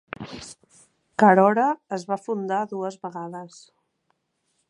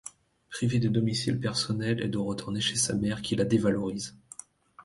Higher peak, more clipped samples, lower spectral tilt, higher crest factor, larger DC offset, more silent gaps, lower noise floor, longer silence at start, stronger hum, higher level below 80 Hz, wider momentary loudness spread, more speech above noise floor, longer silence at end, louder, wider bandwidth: first, -2 dBFS vs -12 dBFS; neither; first, -6.5 dB/octave vs -4.5 dB/octave; first, 22 dB vs 16 dB; neither; neither; first, -73 dBFS vs -50 dBFS; first, 0.2 s vs 0.05 s; neither; second, -66 dBFS vs -58 dBFS; first, 22 LU vs 16 LU; first, 51 dB vs 23 dB; first, 1.25 s vs 0.05 s; first, -22 LUFS vs -28 LUFS; about the same, 11 kHz vs 11.5 kHz